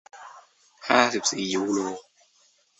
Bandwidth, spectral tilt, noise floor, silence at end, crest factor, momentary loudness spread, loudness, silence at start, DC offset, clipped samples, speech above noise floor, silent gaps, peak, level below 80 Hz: 8.4 kHz; -2.5 dB/octave; -63 dBFS; 0.8 s; 24 dB; 22 LU; -24 LUFS; 0.15 s; under 0.1%; under 0.1%; 39 dB; none; -4 dBFS; -68 dBFS